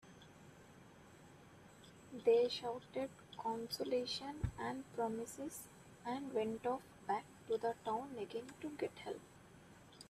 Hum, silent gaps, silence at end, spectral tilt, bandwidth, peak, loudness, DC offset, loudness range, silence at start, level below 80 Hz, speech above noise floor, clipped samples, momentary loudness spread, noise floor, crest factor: none; none; 0 s; -5 dB/octave; 14.5 kHz; -22 dBFS; -42 LUFS; under 0.1%; 4 LU; 0.05 s; -64 dBFS; 20 dB; under 0.1%; 22 LU; -61 dBFS; 20 dB